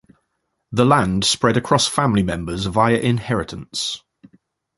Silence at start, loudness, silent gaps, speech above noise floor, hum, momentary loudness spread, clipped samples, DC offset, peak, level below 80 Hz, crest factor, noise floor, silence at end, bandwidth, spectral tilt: 0.7 s; -19 LUFS; none; 55 dB; none; 9 LU; under 0.1%; under 0.1%; -2 dBFS; -42 dBFS; 18 dB; -73 dBFS; 0.8 s; 11.5 kHz; -4.5 dB/octave